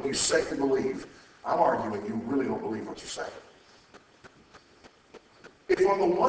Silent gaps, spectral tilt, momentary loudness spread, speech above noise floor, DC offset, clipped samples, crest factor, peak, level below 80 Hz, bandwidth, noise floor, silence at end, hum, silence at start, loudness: none; -3.5 dB/octave; 15 LU; 29 dB; under 0.1%; under 0.1%; 20 dB; -10 dBFS; -60 dBFS; 8 kHz; -57 dBFS; 0 s; none; 0 s; -28 LUFS